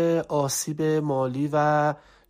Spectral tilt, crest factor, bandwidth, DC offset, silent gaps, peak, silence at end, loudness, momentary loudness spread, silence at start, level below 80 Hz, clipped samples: -5 dB/octave; 14 dB; 15.5 kHz; under 0.1%; none; -10 dBFS; 0.3 s; -24 LUFS; 4 LU; 0 s; -62 dBFS; under 0.1%